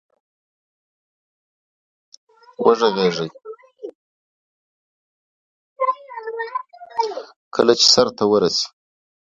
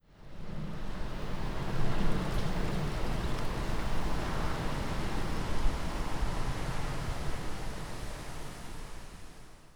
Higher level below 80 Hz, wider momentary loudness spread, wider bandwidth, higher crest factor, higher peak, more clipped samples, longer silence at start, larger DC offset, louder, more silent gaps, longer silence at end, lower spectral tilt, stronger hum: second, -62 dBFS vs -36 dBFS; first, 24 LU vs 11 LU; second, 9.4 kHz vs 12.5 kHz; first, 22 dB vs 16 dB; first, 0 dBFS vs -16 dBFS; neither; first, 2.6 s vs 0.2 s; neither; first, -18 LUFS vs -37 LUFS; first, 3.95-5.76 s, 7.36-7.51 s vs none; first, 0.6 s vs 0.25 s; second, -3 dB/octave vs -5.5 dB/octave; neither